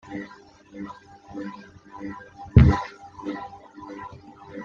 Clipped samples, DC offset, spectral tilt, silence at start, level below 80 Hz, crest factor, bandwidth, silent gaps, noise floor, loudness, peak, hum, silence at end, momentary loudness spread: under 0.1%; under 0.1%; -9 dB/octave; 0.1 s; -34 dBFS; 24 dB; 7 kHz; none; -49 dBFS; -22 LUFS; -2 dBFS; none; 0 s; 27 LU